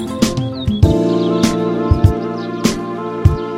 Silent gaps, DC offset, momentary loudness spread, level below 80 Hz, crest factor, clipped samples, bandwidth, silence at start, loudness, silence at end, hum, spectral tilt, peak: none; under 0.1%; 7 LU; -26 dBFS; 16 dB; 0.2%; 16 kHz; 0 s; -16 LUFS; 0 s; none; -6.5 dB/octave; 0 dBFS